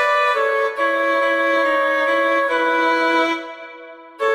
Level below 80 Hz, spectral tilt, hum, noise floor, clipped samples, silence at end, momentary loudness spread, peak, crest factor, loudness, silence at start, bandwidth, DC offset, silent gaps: -68 dBFS; -2 dB/octave; none; -39 dBFS; under 0.1%; 0 s; 11 LU; -6 dBFS; 12 dB; -17 LUFS; 0 s; 15 kHz; under 0.1%; none